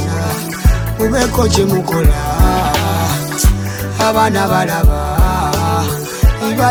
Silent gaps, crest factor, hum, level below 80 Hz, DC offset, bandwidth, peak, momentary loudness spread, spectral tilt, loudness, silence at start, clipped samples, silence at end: none; 12 dB; none; -18 dBFS; under 0.1%; 19.5 kHz; 0 dBFS; 4 LU; -5 dB/octave; -14 LUFS; 0 s; under 0.1%; 0 s